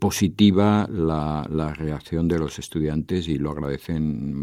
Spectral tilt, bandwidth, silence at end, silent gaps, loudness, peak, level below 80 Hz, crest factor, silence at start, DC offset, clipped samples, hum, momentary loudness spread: -6.5 dB/octave; 15.5 kHz; 0 s; none; -23 LUFS; -4 dBFS; -42 dBFS; 18 dB; 0 s; under 0.1%; under 0.1%; none; 10 LU